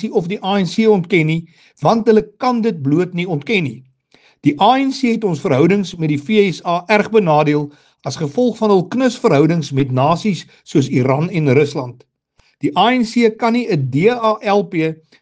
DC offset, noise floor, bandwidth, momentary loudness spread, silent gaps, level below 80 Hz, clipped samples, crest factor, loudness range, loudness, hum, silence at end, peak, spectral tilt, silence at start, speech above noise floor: under 0.1%; -58 dBFS; 9.4 kHz; 7 LU; none; -56 dBFS; under 0.1%; 16 dB; 2 LU; -16 LUFS; none; 0.25 s; 0 dBFS; -6.5 dB/octave; 0 s; 43 dB